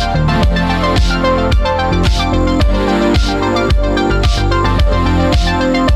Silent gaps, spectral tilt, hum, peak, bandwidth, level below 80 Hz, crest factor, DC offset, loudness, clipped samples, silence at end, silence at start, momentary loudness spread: none; -6 dB/octave; none; -2 dBFS; 12 kHz; -16 dBFS; 10 dB; under 0.1%; -13 LUFS; under 0.1%; 0 s; 0 s; 1 LU